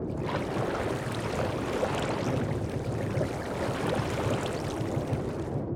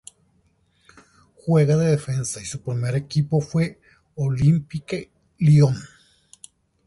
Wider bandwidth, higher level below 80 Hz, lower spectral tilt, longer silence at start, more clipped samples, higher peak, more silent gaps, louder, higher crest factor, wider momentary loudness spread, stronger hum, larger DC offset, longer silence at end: first, 17.5 kHz vs 11.5 kHz; about the same, -48 dBFS vs -52 dBFS; about the same, -6.5 dB/octave vs -7 dB/octave; second, 0 s vs 1.45 s; neither; second, -16 dBFS vs -6 dBFS; neither; second, -31 LUFS vs -22 LUFS; about the same, 14 dB vs 16 dB; second, 3 LU vs 14 LU; neither; neither; second, 0 s vs 1 s